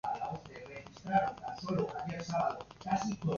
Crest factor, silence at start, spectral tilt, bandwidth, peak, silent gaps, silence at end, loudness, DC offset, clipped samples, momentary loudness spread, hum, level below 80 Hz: 20 dB; 0.05 s; -5.5 dB/octave; 7.2 kHz; -16 dBFS; none; 0 s; -36 LUFS; under 0.1%; under 0.1%; 14 LU; none; -62 dBFS